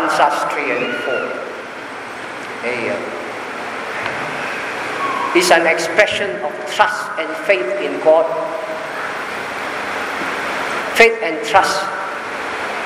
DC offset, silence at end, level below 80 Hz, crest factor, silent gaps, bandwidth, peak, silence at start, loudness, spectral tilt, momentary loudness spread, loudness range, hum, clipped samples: under 0.1%; 0 s; -58 dBFS; 18 dB; none; 16 kHz; 0 dBFS; 0 s; -18 LUFS; -2.5 dB/octave; 13 LU; 7 LU; none; under 0.1%